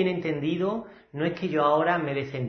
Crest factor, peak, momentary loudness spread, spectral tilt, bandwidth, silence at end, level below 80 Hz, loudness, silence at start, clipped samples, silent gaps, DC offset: 18 dB; -8 dBFS; 8 LU; -8 dB/octave; 6.4 kHz; 0 s; -64 dBFS; -26 LUFS; 0 s; under 0.1%; none; under 0.1%